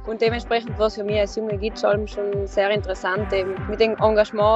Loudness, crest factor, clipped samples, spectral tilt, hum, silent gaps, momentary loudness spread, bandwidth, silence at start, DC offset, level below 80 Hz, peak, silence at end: -22 LUFS; 18 dB; under 0.1%; -6 dB/octave; none; none; 7 LU; 8 kHz; 0 s; under 0.1%; -38 dBFS; -2 dBFS; 0 s